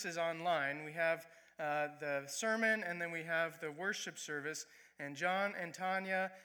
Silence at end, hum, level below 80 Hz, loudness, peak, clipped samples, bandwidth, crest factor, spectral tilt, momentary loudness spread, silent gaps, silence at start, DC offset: 0 s; none; under -90 dBFS; -38 LUFS; -22 dBFS; under 0.1%; over 20 kHz; 18 dB; -3 dB/octave; 10 LU; none; 0 s; under 0.1%